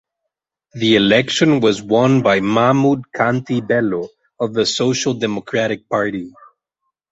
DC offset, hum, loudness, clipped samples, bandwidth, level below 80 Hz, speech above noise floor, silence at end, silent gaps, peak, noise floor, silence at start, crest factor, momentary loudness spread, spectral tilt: under 0.1%; none; -16 LUFS; under 0.1%; 8 kHz; -54 dBFS; 64 dB; 0.85 s; none; -2 dBFS; -80 dBFS; 0.75 s; 16 dB; 9 LU; -5 dB/octave